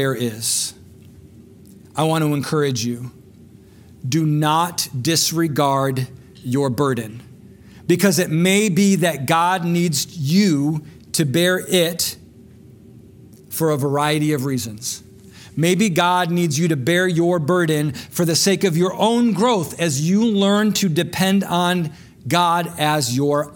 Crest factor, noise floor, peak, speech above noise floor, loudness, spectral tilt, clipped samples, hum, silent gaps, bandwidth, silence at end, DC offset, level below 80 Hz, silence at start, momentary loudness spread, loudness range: 18 dB; -45 dBFS; 0 dBFS; 27 dB; -18 LUFS; -4.5 dB/octave; under 0.1%; none; none; 18 kHz; 0 s; under 0.1%; -58 dBFS; 0 s; 10 LU; 5 LU